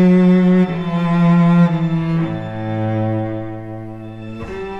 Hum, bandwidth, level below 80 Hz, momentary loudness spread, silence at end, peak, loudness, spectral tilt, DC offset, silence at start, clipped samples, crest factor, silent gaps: none; 5.6 kHz; -44 dBFS; 18 LU; 0 s; -4 dBFS; -16 LUFS; -9.5 dB/octave; 0.7%; 0 s; under 0.1%; 12 dB; none